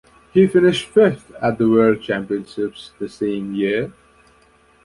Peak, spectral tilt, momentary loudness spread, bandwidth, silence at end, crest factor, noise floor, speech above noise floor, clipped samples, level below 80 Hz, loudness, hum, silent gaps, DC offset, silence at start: -2 dBFS; -6.5 dB/octave; 12 LU; 11.5 kHz; 0.95 s; 16 dB; -54 dBFS; 36 dB; under 0.1%; -54 dBFS; -18 LUFS; none; none; under 0.1%; 0.35 s